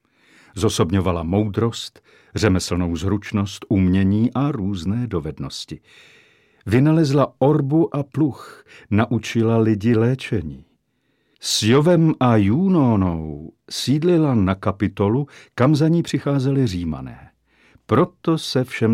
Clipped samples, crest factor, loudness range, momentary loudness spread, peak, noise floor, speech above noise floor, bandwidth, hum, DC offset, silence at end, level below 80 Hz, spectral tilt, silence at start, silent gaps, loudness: under 0.1%; 18 dB; 3 LU; 14 LU; -2 dBFS; -67 dBFS; 49 dB; 15.5 kHz; none; under 0.1%; 0 s; -46 dBFS; -6.5 dB/octave; 0.55 s; none; -19 LUFS